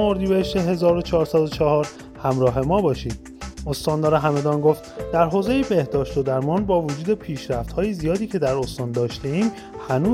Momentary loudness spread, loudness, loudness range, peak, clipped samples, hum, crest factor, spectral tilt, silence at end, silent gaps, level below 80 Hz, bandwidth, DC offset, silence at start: 8 LU; -22 LUFS; 3 LU; -4 dBFS; under 0.1%; none; 16 dB; -7 dB/octave; 0 s; none; -40 dBFS; 16 kHz; under 0.1%; 0 s